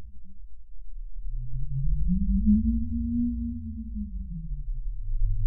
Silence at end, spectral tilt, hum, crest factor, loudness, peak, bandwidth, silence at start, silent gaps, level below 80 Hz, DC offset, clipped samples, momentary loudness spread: 0 s; -22.5 dB/octave; none; 14 dB; -30 LUFS; -12 dBFS; 0.4 kHz; 0 s; none; -30 dBFS; under 0.1%; under 0.1%; 19 LU